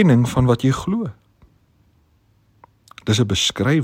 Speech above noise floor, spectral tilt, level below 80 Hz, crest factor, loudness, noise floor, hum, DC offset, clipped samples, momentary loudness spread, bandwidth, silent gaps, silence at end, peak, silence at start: 42 dB; -5.5 dB/octave; -44 dBFS; 18 dB; -19 LUFS; -59 dBFS; none; under 0.1%; under 0.1%; 10 LU; 15.5 kHz; none; 0 s; -2 dBFS; 0 s